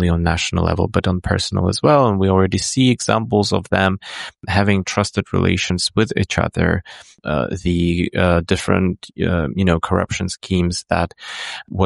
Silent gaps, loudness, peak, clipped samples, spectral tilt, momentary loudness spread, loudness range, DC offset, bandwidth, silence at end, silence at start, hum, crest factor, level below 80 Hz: none; -18 LUFS; -2 dBFS; under 0.1%; -5.5 dB/octave; 8 LU; 3 LU; under 0.1%; 11.5 kHz; 0 s; 0 s; none; 16 dB; -36 dBFS